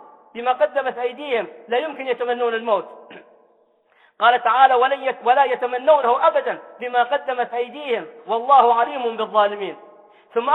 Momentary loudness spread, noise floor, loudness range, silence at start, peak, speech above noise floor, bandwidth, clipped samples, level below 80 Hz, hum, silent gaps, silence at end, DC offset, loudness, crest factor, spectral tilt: 12 LU; -59 dBFS; 6 LU; 0.35 s; -2 dBFS; 40 dB; 4.2 kHz; under 0.1%; -78 dBFS; none; none; 0 s; under 0.1%; -19 LUFS; 18 dB; -5 dB/octave